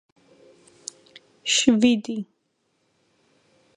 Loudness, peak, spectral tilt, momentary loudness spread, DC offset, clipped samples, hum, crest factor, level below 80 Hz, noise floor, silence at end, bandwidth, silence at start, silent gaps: -21 LUFS; -4 dBFS; -2.5 dB/octave; 22 LU; under 0.1%; under 0.1%; none; 22 dB; -64 dBFS; -71 dBFS; 1.55 s; 11 kHz; 1.45 s; none